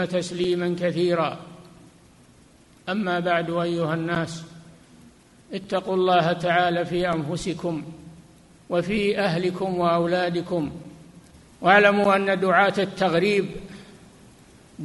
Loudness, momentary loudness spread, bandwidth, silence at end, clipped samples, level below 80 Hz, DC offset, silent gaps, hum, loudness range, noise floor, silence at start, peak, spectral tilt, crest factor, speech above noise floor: -23 LUFS; 17 LU; 11.5 kHz; 0 s; under 0.1%; -56 dBFS; under 0.1%; none; none; 7 LU; -53 dBFS; 0 s; -2 dBFS; -6 dB/octave; 22 dB; 31 dB